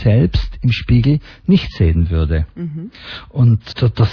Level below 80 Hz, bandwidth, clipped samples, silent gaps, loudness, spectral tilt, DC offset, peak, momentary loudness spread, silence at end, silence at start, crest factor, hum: -24 dBFS; 5.4 kHz; under 0.1%; none; -16 LUFS; -9 dB/octave; under 0.1%; -2 dBFS; 13 LU; 0 s; 0 s; 14 dB; none